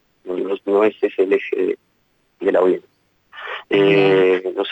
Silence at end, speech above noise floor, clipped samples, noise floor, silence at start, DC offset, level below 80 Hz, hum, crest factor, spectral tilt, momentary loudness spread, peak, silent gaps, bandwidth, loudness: 0 s; 47 dB; under 0.1%; -63 dBFS; 0.25 s; under 0.1%; -68 dBFS; none; 14 dB; -7.5 dB/octave; 16 LU; -6 dBFS; none; 5.8 kHz; -18 LUFS